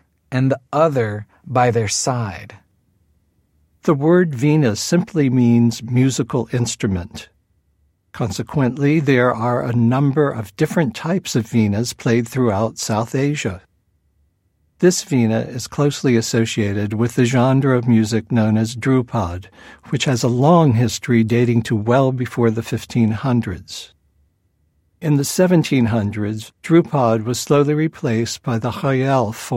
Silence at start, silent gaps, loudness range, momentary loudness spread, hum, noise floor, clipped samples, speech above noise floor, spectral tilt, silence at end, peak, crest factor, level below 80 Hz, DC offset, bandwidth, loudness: 0.3 s; none; 4 LU; 9 LU; none; -64 dBFS; under 0.1%; 47 dB; -6 dB/octave; 0 s; -2 dBFS; 16 dB; -52 dBFS; under 0.1%; 16 kHz; -18 LUFS